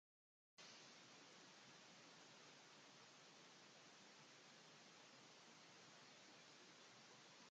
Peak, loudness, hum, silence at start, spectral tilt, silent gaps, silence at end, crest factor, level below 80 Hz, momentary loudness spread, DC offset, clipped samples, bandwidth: -50 dBFS; -64 LUFS; none; 0.55 s; -2 dB/octave; none; 0 s; 16 dB; under -90 dBFS; 1 LU; under 0.1%; under 0.1%; 8.8 kHz